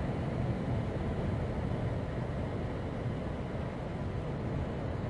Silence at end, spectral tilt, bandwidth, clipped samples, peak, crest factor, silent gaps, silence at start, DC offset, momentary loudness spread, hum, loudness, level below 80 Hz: 0 s; -8.5 dB/octave; 11 kHz; under 0.1%; -22 dBFS; 12 dB; none; 0 s; under 0.1%; 3 LU; none; -36 LUFS; -44 dBFS